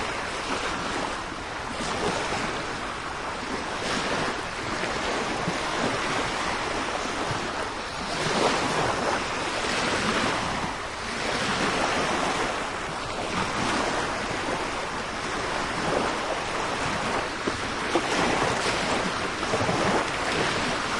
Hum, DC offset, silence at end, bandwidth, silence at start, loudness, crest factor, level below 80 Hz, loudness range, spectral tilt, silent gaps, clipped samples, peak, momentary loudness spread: none; under 0.1%; 0 s; 11.5 kHz; 0 s; -27 LUFS; 20 dB; -46 dBFS; 3 LU; -3.5 dB/octave; none; under 0.1%; -8 dBFS; 6 LU